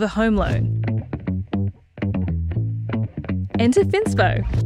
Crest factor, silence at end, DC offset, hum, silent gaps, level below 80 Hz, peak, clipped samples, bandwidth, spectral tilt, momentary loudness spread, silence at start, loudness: 16 dB; 0 s; under 0.1%; none; none; -34 dBFS; -4 dBFS; under 0.1%; 11 kHz; -7 dB/octave; 9 LU; 0 s; -22 LUFS